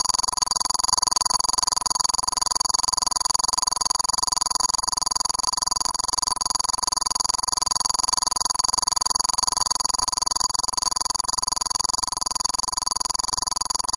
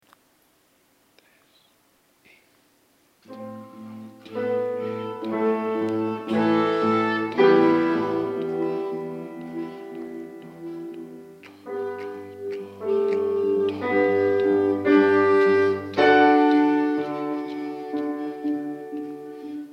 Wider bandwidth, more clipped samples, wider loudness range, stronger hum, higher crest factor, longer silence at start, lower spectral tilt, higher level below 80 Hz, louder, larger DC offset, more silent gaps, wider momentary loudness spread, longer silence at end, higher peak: first, 11.5 kHz vs 7 kHz; neither; second, 2 LU vs 15 LU; neither; about the same, 22 dB vs 18 dB; second, 0 s vs 3.3 s; second, 1 dB/octave vs -7 dB/octave; first, -48 dBFS vs -74 dBFS; about the same, -21 LUFS vs -22 LUFS; first, 0.3% vs under 0.1%; neither; second, 3 LU vs 20 LU; about the same, 0 s vs 0 s; about the same, -2 dBFS vs -4 dBFS